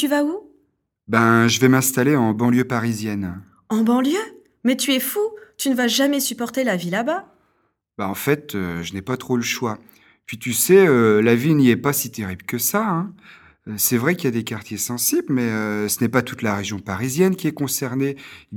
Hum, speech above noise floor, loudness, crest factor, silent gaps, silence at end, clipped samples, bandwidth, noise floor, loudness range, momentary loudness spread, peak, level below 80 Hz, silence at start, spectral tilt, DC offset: none; 47 dB; -20 LUFS; 20 dB; none; 0 s; under 0.1%; 19 kHz; -67 dBFS; 6 LU; 13 LU; 0 dBFS; -60 dBFS; 0 s; -4.5 dB/octave; under 0.1%